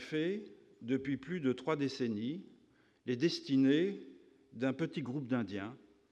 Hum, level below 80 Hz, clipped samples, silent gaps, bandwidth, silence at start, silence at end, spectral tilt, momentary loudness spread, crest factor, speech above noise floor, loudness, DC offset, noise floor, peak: none; -78 dBFS; under 0.1%; none; 8.8 kHz; 0 s; 0.35 s; -6.5 dB/octave; 17 LU; 18 dB; 33 dB; -36 LUFS; under 0.1%; -68 dBFS; -18 dBFS